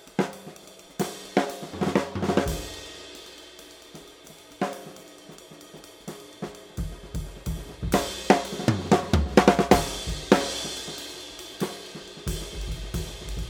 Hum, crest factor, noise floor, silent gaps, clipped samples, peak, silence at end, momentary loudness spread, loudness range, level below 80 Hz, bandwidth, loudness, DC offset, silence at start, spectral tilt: none; 28 dB; -48 dBFS; none; under 0.1%; 0 dBFS; 0 s; 23 LU; 16 LU; -40 dBFS; over 20 kHz; -27 LUFS; under 0.1%; 0 s; -5 dB/octave